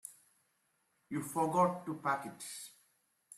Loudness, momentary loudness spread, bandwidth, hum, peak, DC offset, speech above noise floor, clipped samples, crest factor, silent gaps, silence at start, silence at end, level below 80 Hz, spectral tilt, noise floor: -36 LUFS; 17 LU; 15 kHz; none; -18 dBFS; under 0.1%; 43 dB; under 0.1%; 20 dB; none; 0.05 s; 0.05 s; -80 dBFS; -5 dB/octave; -78 dBFS